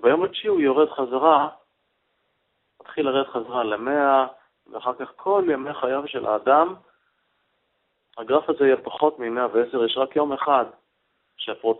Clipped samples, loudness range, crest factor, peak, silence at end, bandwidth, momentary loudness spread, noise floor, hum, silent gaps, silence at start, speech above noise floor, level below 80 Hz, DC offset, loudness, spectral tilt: under 0.1%; 3 LU; 20 dB; -2 dBFS; 0 s; 4.1 kHz; 11 LU; -72 dBFS; none; none; 0 s; 50 dB; -68 dBFS; under 0.1%; -22 LUFS; -9 dB/octave